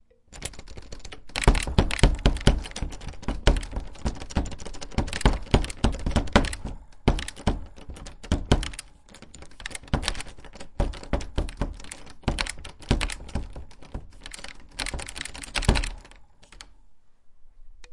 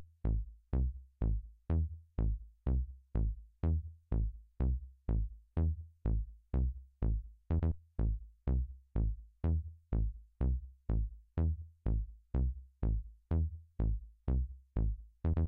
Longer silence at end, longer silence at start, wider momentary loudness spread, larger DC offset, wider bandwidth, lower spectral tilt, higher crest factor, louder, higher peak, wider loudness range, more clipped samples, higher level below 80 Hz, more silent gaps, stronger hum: about the same, 0 s vs 0 s; first, 0.3 s vs 0 s; first, 20 LU vs 4 LU; neither; first, 11.5 kHz vs 2.7 kHz; second, -5 dB/octave vs -11.5 dB/octave; first, 26 dB vs 12 dB; first, -28 LUFS vs -38 LUFS; first, 0 dBFS vs -24 dBFS; first, 7 LU vs 1 LU; neither; first, -30 dBFS vs -38 dBFS; neither; neither